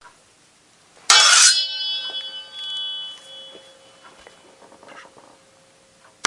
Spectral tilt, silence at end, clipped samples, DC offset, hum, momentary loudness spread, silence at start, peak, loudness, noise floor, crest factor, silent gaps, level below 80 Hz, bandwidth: 4 dB/octave; 1.25 s; under 0.1%; under 0.1%; none; 27 LU; 1.1 s; 0 dBFS; -15 LUFS; -55 dBFS; 22 dB; none; -76 dBFS; 12 kHz